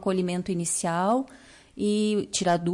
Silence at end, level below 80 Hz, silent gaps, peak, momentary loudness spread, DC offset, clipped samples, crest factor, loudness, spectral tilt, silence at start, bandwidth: 0 s; -60 dBFS; none; -14 dBFS; 6 LU; under 0.1%; under 0.1%; 14 dB; -26 LUFS; -4.5 dB/octave; 0 s; 11.5 kHz